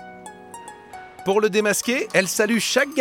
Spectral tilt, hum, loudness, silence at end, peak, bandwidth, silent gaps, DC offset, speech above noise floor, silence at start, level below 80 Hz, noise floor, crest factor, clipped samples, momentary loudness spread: -3 dB/octave; none; -20 LUFS; 0 s; -2 dBFS; 17.5 kHz; none; under 0.1%; 21 dB; 0 s; -64 dBFS; -41 dBFS; 20 dB; under 0.1%; 21 LU